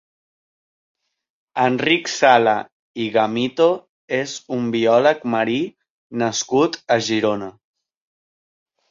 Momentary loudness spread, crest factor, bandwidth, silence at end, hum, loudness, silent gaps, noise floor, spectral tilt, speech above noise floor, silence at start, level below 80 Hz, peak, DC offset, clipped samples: 13 LU; 20 dB; 7.6 kHz; 1.4 s; none; -19 LUFS; 2.72-2.94 s, 3.89-4.08 s, 5.90-6.10 s; under -90 dBFS; -4 dB/octave; over 72 dB; 1.55 s; -64 dBFS; -2 dBFS; under 0.1%; under 0.1%